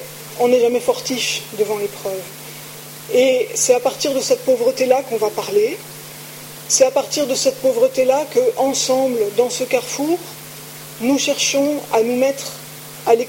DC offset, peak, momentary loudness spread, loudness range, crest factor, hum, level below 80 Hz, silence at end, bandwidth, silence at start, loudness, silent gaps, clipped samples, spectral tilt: under 0.1%; -2 dBFS; 17 LU; 2 LU; 16 dB; none; -64 dBFS; 0 s; 17 kHz; 0 s; -17 LUFS; none; under 0.1%; -2.5 dB/octave